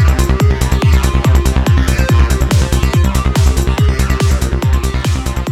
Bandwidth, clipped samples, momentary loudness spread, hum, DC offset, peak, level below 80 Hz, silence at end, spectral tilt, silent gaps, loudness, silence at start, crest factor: 14.5 kHz; under 0.1%; 3 LU; none; under 0.1%; 0 dBFS; -14 dBFS; 0 s; -5.5 dB/octave; none; -13 LUFS; 0 s; 10 dB